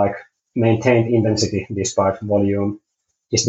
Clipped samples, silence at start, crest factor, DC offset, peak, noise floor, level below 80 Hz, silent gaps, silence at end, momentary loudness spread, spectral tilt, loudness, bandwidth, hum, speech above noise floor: under 0.1%; 0 s; 18 dB; under 0.1%; -2 dBFS; -67 dBFS; -52 dBFS; none; 0 s; 11 LU; -5 dB/octave; -19 LUFS; 8.2 kHz; none; 49 dB